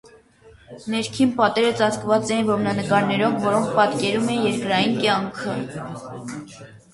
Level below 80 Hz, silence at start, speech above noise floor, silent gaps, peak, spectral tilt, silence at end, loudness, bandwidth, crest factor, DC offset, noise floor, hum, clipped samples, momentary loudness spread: -58 dBFS; 0.05 s; 29 dB; none; -4 dBFS; -5 dB/octave; 0.15 s; -21 LUFS; 11.5 kHz; 18 dB; under 0.1%; -50 dBFS; none; under 0.1%; 15 LU